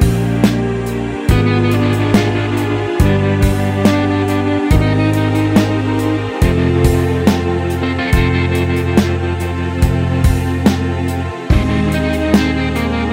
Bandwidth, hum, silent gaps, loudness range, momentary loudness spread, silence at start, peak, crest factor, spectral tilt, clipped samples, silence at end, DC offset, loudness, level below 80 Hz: 16 kHz; none; none; 2 LU; 5 LU; 0 s; 0 dBFS; 14 dB; -7 dB/octave; under 0.1%; 0 s; under 0.1%; -15 LUFS; -24 dBFS